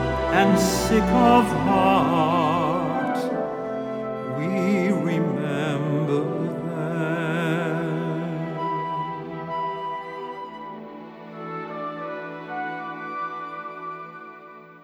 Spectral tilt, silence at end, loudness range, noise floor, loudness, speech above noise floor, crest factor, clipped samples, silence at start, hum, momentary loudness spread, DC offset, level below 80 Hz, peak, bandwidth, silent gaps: -6 dB/octave; 0.05 s; 12 LU; -44 dBFS; -24 LUFS; 26 dB; 20 dB; under 0.1%; 0 s; none; 17 LU; under 0.1%; -46 dBFS; -4 dBFS; 18 kHz; none